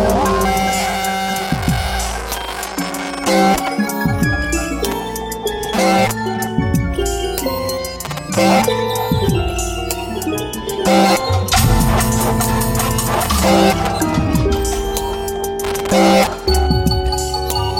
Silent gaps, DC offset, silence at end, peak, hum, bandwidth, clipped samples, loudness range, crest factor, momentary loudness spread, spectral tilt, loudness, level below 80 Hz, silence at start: none; under 0.1%; 0 s; -2 dBFS; none; 17 kHz; under 0.1%; 3 LU; 16 dB; 9 LU; -4.5 dB/octave; -17 LUFS; -26 dBFS; 0 s